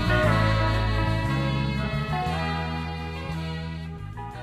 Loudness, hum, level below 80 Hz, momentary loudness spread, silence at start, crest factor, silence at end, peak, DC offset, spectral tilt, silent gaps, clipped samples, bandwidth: -26 LUFS; none; -34 dBFS; 13 LU; 0 s; 16 dB; 0 s; -10 dBFS; under 0.1%; -6.5 dB/octave; none; under 0.1%; 13 kHz